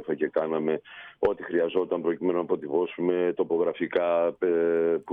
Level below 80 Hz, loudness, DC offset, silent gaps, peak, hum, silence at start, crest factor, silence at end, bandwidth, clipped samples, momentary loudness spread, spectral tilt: -64 dBFS; -27 LUFS; under 0.1%; none; -12 dBFS; none; 0 s; 14 dB; 0 s; 3.9 kHz; under 0.1%; 4 LU; -9 dB/octave